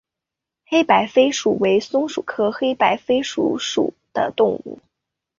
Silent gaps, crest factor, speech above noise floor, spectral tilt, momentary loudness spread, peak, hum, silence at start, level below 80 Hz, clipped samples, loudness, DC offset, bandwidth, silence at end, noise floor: none; 18 dB; 66 dB; -4 dB/octave; 8 LU; -2 dBFS; none; 0.7 s; -62 dBFS; under 0.1%; -19 LUFS; under 0.1%; 7.6 kHz; 0.65 s; -85 dBFS